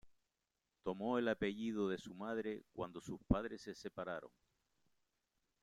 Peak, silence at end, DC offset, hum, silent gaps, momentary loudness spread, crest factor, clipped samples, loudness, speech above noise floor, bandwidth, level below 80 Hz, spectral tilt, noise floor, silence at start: -18 dBFS; 1.35 s; under 0.1%; none; none; 11 LU; 26 dB; under 0.1%; -43 LUFS; 47 dB; 12.5 kHz; -60 dBFS; -6.5 dB/octave; -89 dBFS; 0.05 s